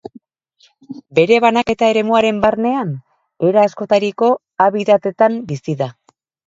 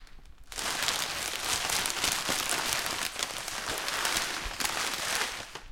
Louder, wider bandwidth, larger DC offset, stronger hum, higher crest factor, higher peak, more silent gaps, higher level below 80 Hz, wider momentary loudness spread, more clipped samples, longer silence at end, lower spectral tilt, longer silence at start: first, -15 LUFS vs -30 LUFS; second, 7.8 kHz vs 17 kHz; neither; neither; second, 16 dB vs 26 dB; first, 0 dBFS vs -6 dBFS; neither; about the same, -54 dBFS vs -52 dBFS; first, 11 LU vs 5 LU; neither; first, 0.55 s vs 0 s; first, -6 dB/octave vs 0 dB/octave; first, 0.9 s vs 0 s